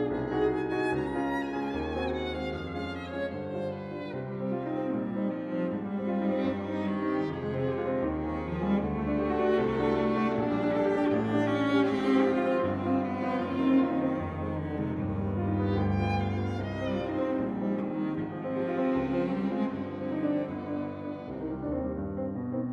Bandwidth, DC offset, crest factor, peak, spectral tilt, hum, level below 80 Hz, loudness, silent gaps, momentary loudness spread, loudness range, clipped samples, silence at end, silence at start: 9.2 kHz; under 0.1%; 16 dB; -14 dBFS; -8.5 dB/octave; none; -52 dBFS; -30 LUFS; none; 8 LU; 6 LU; under 0.1%; 0 s; 0 s